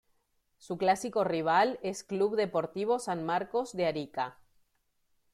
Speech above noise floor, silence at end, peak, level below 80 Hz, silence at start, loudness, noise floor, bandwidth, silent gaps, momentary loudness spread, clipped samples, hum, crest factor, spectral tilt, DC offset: 45 dB; 1 s; -14 dBFS; -72 dBFS; 0.65 s; -31 LUFS; -75 dBFS; 14.5 kHz; none; 10 LU; under 0.1%; none; 18 dB; -5 dB/octave; under 0.1%